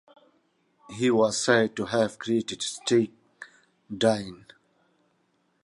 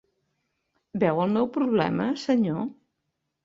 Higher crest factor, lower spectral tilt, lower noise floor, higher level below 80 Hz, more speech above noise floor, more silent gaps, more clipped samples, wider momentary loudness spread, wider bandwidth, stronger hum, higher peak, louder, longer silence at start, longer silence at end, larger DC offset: about the same, 22 dB vs 18 dB; second, -4 dB/octave vs -7.5 dB/octave; second, -70 dBFS vs -80 dBFS; about the same, -66 dBFS vs -64 dBFS; second, 45 dB vs 56 dB; neither; neither; first, 23 LU vs 8 LU; first, 11.5 kHz vs 7.8 kHz; neither; about the same, -6 dBFS vs -8 dBFS; about the same, -25 LUFS vs -25 LUFS; about the same, 0.9 s vs 0.95 s; first, 1.3 s vs 0.7 s; neither